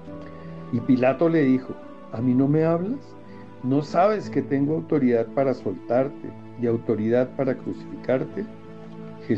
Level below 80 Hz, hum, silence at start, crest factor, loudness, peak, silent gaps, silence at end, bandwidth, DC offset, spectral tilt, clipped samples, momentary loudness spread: -66 dBFS; none; 0 s; 16 dB; -23 LUFS; -8 dBFS; none; 0 s; 7.4 kHz; 0.5%; -9 dB/octave; under 0.1%; 19 LU